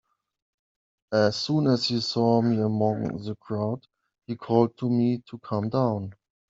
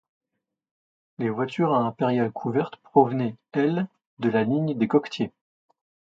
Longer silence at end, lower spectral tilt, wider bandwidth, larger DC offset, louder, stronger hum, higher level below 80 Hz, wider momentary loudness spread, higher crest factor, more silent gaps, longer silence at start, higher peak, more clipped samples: second, 0.35 s vs 0.9 s; second, -7 dB/octave vs -8.5 dB/octave; about the same, 7.8 kHz vs 7.6 kHz; neither; about the same, -25 LUFS vs -25 LUFS; neither; about the same, -66 dBFS vs -70 dBFS; about the same, 11 LU vs 9 LU; about the same, 20 dB vs 22 dB; second, none vs 4.06-4.17 s; about the same, 1.1 s vs 1.2 s; about the same, -6 dBFS vs -4 dBFS; neither